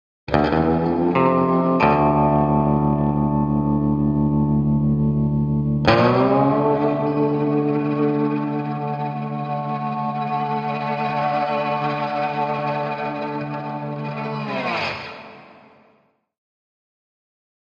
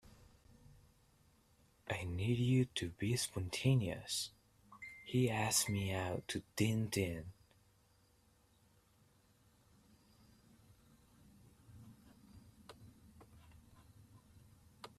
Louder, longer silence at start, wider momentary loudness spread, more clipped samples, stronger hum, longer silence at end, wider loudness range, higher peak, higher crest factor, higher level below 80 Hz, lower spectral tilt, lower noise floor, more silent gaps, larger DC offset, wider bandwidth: first, -20 LUFS vs -38 LUFS; second, 0.3 s vs 1.85 s; second, 10 LU vs 25 LU; neither; neither; first, 2.3 s vs 0.1 s; first, 10 LU vs 6 LU; first, -2 dBFS vs -20 dBFS; about the same, 18 dB vs 22 dB; first, -40 dBFS vs -68 dBFS; first, -9 dB/octave vs -4.5 dB/octave; second, -61 dBFS vs -72 dBFS; neither; neither; second, 6.8 kHz vs 15.5 kHz